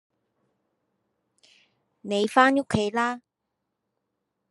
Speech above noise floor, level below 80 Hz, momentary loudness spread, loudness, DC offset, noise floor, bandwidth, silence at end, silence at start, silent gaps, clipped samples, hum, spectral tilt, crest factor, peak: 59 dB; -64 dBFS; 16 LU; -23 LUFS; under 0.1%; -82 dBFS; 12 kHz; 1.35 s; 2.05 s; none; under 0.1%; none; -5 dB/octave; 24 dB; -4 dBFS